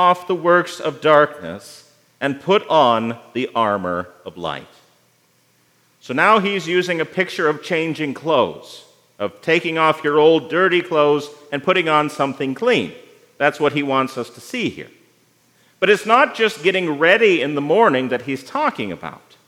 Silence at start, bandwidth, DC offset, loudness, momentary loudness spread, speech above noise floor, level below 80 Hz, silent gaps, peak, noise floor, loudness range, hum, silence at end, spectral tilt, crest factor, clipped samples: 0 s; 15.5 kHz; under 0.1%; -18 LUFS; 14 LU; 41 dB; -70 dBFS; none; 0 dBFS; -59 dBFS; 5 LU; none; 0.3 s; -5 dB/octave; 18 dB; under 0.1%